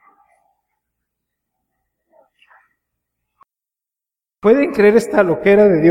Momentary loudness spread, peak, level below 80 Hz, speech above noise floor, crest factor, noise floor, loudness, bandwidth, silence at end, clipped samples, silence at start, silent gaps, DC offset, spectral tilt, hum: 4 LU; 0 dBFS; -54 dBFS; 76 dB; 18 dB; -88 dBFS; -13 LUFS; 12.5 kHz; 0 s; under 0.1%; 4.45 s; none; under 0.1%; -7 dB/octave; none